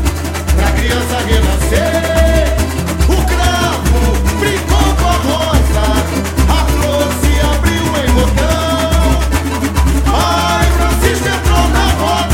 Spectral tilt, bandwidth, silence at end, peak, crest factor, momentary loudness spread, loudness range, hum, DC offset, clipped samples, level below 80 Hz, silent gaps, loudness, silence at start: -5 dB/octave; 16.5 kHz; 0 s; 0 dBFS; 12 dB; 3 LU; 0 LU; none; under 0.1%; under 0.1%; -14 dBFS; none; -13 LUFS; 0 s